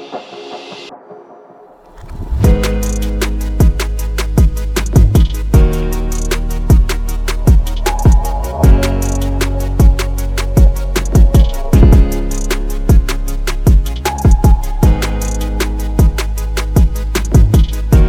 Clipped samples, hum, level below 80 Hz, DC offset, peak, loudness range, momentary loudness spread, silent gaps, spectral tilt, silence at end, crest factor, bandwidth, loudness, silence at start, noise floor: under 0.1%; none; -12 dBFS; under 0.1%; 0 dBFS; 3 LU; 9 LU; none; -6 dB/octave; 0 s; 12 dB; 15.5 kHz; -14 LUFS; 0 s; -40 dBFS